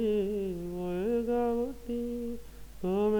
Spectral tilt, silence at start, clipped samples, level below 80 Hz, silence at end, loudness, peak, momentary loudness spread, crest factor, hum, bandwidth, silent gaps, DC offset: -7.5 dB/octave; 0 s; under 0.1%; -50 dBFS; 0 s; -33 LUFS; -20 dBFS; 9 LU; 12 dB; none; over 20 kHz; none; under 0.1%